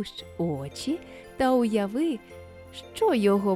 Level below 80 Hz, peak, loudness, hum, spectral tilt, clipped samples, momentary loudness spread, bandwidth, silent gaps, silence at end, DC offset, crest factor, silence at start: -56 dBFS; -10 dBFS; -27 LUFS; none; -6 dB/octave; under 0.1%; 20 LU; 14.5 kHz; none; 0 s; under 0.1%; 16 dB; 0 s